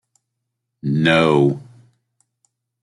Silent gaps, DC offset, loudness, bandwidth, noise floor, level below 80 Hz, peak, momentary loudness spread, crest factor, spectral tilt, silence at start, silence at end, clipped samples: none; under 0.1%; -17 LUFS; 11.5 kHz; -78 dBFS; -56 dBFS; -2 dBFS; 15 LU; 18 dB; -7 dB/octave; 0.85 s; 1.2 s; under 0.1%